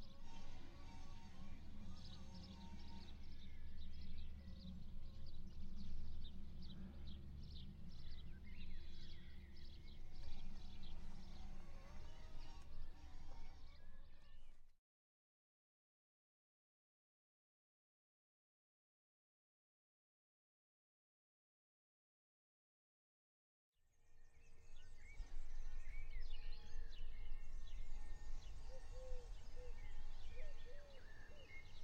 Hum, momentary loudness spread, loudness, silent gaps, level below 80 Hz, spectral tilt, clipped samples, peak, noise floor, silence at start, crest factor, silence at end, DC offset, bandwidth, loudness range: none; 5 LU; -59 LUFS; 14.78-23.73 s; -52 dBFS; -5.5 dB/octave; under 0.1%; -34 dBFS; under -90 dBFS; 0 s; 14 dB; 0 s; under 0.1%; 6.8 kHz; 6 LU